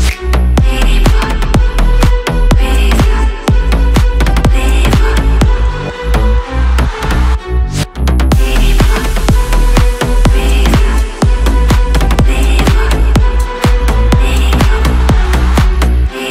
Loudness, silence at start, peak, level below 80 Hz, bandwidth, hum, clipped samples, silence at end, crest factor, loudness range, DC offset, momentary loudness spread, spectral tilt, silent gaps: -12 LUFS; 0 s; 0 dBFS; -10 dBFS; 15 kHz; none; under 0.1%; 0 s; 8 dB; 2 LU; under 0.1%; 3 LU; -5.5 dB/octave; none